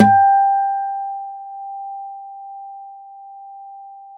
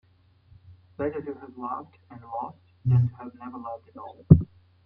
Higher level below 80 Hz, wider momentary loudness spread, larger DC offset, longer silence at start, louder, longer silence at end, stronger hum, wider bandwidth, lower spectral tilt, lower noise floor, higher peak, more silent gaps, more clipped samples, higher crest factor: second, -66 dBFS vs -48 dBFS; first, 25 LU vs 22 LU; neither; second, 0 s vs 1 s; first, -18 LUFS vs -26 LUFS; second, 0 s vs 0.4 s; neither; first, 4.8 kHz vs 3 kHz; second, -7.5 dB/octave vs -13 dB/octave; second, -38 dBFS vs -59 dBFS; about the same, 0 dBFS vs -2 dBFS; neither; neither; second, 20 dB vs 26 dB